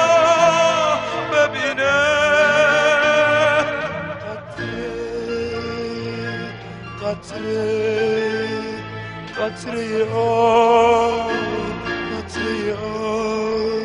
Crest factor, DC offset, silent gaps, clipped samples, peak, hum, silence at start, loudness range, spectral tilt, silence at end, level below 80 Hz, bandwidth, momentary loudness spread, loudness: 16 dB; under 0.1%; none; under 0.1%; -2 dBFS; none; 0 s; 10 LU; -4 dB/octave; 0 s; -48 dBFS; 10.5 kHz; 14 LU; -19 LUFS